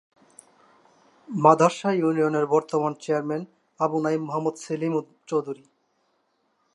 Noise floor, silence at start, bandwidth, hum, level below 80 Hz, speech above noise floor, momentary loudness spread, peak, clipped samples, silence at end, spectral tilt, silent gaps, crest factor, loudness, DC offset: -70 dBFS; 1.3 s; 11.5 kHz; none; -80 dBFS; 47 dB; 13 LU; -2 dBFS; under 0.1%; 1.2 s; -6.5 dB/octave; none; 24 dB; -24 LUFS; under 0.1%